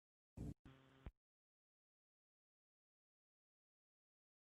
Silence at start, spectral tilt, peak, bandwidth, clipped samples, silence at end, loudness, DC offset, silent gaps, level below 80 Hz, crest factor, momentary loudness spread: 0.35 s; -8 dB/octave; -40 dBFS; 8 kHz; under 0.1%; 3.45 s; -59 LUFS; under 0.1%; 0.59-0.65 s; -70 dBFS; 24 dB; 11 LU